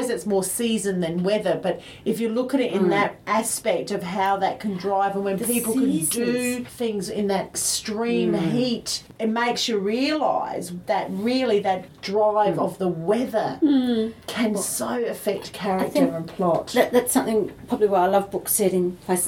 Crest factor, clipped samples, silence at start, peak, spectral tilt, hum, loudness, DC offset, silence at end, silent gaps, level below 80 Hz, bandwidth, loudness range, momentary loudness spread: 18 dB; under 0.1%; 0 s; -4 dBFS; -4 dB/octave; none; -23 LUFS; under 0.1%; 0 s; none; -58 dBFS; 17.5 kHz; 2 LU; 7 LU